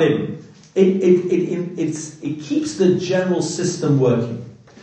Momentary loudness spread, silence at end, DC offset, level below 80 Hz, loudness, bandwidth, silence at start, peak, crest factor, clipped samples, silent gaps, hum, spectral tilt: 12 LU; 0.3 s; under 0.1%; -62 dBFS; -19 LUFS; 9 kHz; 0 s; -2 dBFS; 18 dB; under 0.1%; none; none; -6.5 dB/octave